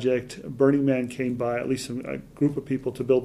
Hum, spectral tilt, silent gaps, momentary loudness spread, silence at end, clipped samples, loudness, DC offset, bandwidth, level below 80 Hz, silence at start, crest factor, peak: none; -7 dB/octave; none; 11 LU; 0 s; under 0.1%; -26 LUFS; under 0.1%; 13.5 kHz; -56 dBFS; 0 s; 18 dB; -8 dBFS